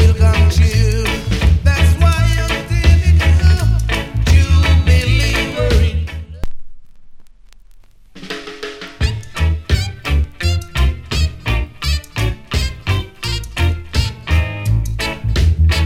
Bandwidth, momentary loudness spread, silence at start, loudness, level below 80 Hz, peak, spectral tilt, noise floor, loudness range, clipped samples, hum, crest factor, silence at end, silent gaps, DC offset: 14 kHz; 10 LU; 0 s; -16 LUFS; -20 dBFS; 0 dBFS; -5.5 dB/octave; -41 dBFS; 10 LU; under 0.1%; none; 14 dB; 0 s; none; under 0.1%